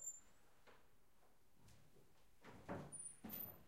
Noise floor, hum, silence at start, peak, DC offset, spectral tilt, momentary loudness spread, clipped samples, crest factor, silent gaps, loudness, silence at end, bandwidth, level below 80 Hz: -77 dBFS; none; 0 s; -38 dBFS; under 0.1%; -3.5 dB/octave; 13 LU; under 0.1%; 20 dB; none; -53 LUFS; 0 s; 16 kHz; -78 dBFS